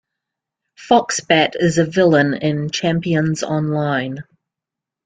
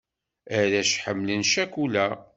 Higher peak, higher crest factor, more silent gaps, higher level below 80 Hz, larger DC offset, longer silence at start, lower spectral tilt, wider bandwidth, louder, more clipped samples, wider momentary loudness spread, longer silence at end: first, 0 dBFS vs -8 dBFS; about the same, 18 dB vs 18 dB; neither; first, -56 dBFS vs -66 dBFS; neither; first, 0.8 s vs 0.45 s; first, -5 dB/octave vs -3 dB/octave; first, 9.4 kHz vs 8.2 kHz; first, -17 LUFS vs -24 LUFS; neither; about the same, 6 LU vs 5 LU; first, 0.85 s vs 0.15 s